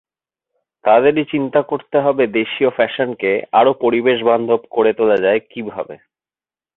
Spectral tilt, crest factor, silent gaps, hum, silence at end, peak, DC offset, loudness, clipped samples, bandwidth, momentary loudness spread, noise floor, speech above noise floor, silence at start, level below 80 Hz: -8.5 dB/octave; 16 dB; none; none; 0.8 s; -2 dBFS; under 0.1%; -16 LUFS; under 0.1%; 4.1 kHz; 8 LU; under -90 dBFS; over 74 dB; 0.85 s; -60 dBFS